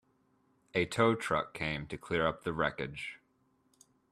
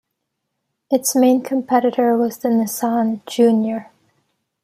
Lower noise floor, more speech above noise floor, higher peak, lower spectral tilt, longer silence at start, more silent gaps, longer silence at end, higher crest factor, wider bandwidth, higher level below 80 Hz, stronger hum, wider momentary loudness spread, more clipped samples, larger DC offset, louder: about the same, -73 dBFS vs -76 dBFS; second, 40 dB vs 59 dB; second, -12 dBFS vs -2 dBFS; about the same, -5.5 dB/octave vs -4.5 dB/octave; second, 0.75 s vs 0.9 s; neither; first, 0.95 s vs 0.8 s; first, 22 dB vs 16 dB; second, 14 kHz vs 15.5 kHz; first, -60 dBFS vs -70 dBFS; neither; first, 11 LU vs 6 LU; neither; neither; second, -33 LUFS vs -18 LUFS